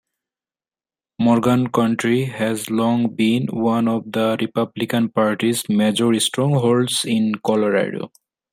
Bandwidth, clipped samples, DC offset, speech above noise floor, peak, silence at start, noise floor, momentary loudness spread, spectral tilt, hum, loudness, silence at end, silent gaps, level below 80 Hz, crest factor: 16 kHz; under 0.1%; under 0.1%; over 72 dB; -4 dBFS; 1.2 s; under -90 dBFS; 5 LU; -5 dB/octave; none; -19 LUFS; 0.45 s; none; -60 dBFS; 16 dB